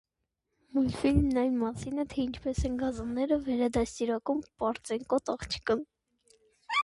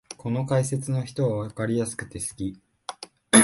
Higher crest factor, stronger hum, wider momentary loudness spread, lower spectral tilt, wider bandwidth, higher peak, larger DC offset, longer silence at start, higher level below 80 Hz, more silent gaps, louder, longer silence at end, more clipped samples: second, 18 dB vs 24 dB; neither; second, 7 LU vs 14 LU; first, -6 dB/octave vs -4.5 dB/octave; about the same, 11.5 kHz vs 12 kHz; second, -12 dBFS vs 0 dBFS; neither; first, 0.75 s vs 0.1 s; first, -44 dBFS vs -54 dBFS; neither; second, -31 LUFS vs -27 LUFS; about the same, 0 s vs 0 s; neither